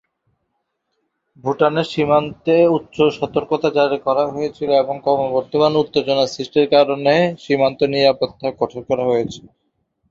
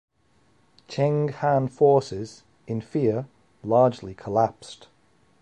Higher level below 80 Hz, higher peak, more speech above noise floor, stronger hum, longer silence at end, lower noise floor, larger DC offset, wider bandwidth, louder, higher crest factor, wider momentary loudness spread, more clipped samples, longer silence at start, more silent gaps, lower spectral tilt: about the same, -56 dBFS vs -60 dBFS; first, -2 dBFS vs -8 dBFS; first, 56 dB vs 41 dB; neither; about the same, 0.7 s vs 0.65 s; first, -73 dBFS vs -64 dBFS; neither; second, 7.6 kHz vs 10 kHz; first, -18 LUFS vs -24 LUFS; about the same, 16 dB vs 18 dB; second, 8 LU vs 19 LU; neither; first, 1.45 s vs 0.9 s; neither; second, -6 dB/octave vs -7.5 dB/octave